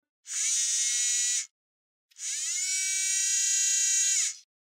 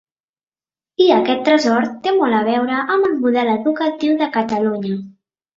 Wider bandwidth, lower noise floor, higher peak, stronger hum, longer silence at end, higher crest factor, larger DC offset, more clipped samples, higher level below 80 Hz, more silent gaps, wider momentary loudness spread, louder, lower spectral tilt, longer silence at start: first, 16 kHz vs 7.6 kHz; about the same, under -90 dBFS vs under -90 dBFS; second, -16 dBFS vs -2 dBFS; neither; about the same, 0.35 s vs 0.45 s; about the same, 14 dB vs 16 dB; neither; neither; second, under -90 dBFS vs -62 dBFS; first, 1.51-2.09 s vs none; first, 11 LU vs 6 LU; second, -25 LUFS vs -17 LUFS; second, 13 dB/octave vs -5.5 dB/octave; second, 0.25 s vs 1 s